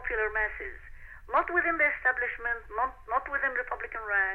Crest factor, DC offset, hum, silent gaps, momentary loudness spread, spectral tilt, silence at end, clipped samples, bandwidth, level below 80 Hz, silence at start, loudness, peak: 18 dB; under 0.1%; none; none; 11 LU; -6.5 dB/octave; 0 s; under 0.1%; 4.6 kHz; -50 dBFS; 0 s; -29 LUFS; -14 dBFS